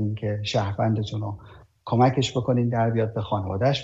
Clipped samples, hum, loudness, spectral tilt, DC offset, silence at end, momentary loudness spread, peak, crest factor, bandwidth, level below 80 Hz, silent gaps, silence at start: under 0.1%; none; -24 LUFS; -6.5 dB/octave; under 0.1%; 0 s; 11 LU; -8 dBFS; 16 dB; 7.8 kHz; -54 dBFS; none; 0 s